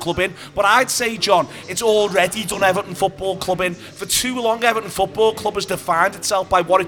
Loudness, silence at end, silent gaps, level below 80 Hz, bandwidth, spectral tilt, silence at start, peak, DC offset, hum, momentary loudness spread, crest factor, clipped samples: -18 LUFS; 0 s; none; -48 dBFS; over 20 kHz; -2.5 dB/octave; 0 s; 0 dBFS; under 0.1%; none; 7 LU; 18 dB; under 0.1%